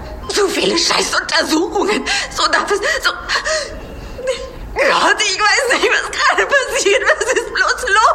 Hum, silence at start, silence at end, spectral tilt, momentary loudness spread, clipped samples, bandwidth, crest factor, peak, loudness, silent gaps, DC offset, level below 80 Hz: none; 0 s; 0 s; -1.5 dB/octave; 10 LU; under 0.1%; 16 kHz; 14 dB; 0 dBFS; -14 LUFS; none; under 0.1%; -38 dBFS